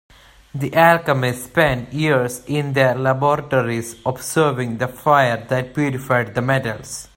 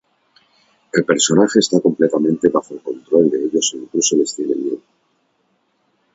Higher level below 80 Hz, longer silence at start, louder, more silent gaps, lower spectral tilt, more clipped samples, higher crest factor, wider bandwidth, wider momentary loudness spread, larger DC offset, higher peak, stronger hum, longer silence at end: first, -48 dBFS vs -60 dBFS; second, 0.55 s vs 0.95 s; second, -19 LUFS vs -16 LUFS; neither; first, -5.5 dB/octave vs -4 dB/octave; neither; about the same, 18 dB vs 18 dB; first, 16.5 kHz vs 8 kHz; about the same, 9 LU vs 9 LU; neither; about the same, 0 dBFS vs 0 dBFS; neither; second, 0.1 s vs 1.35 s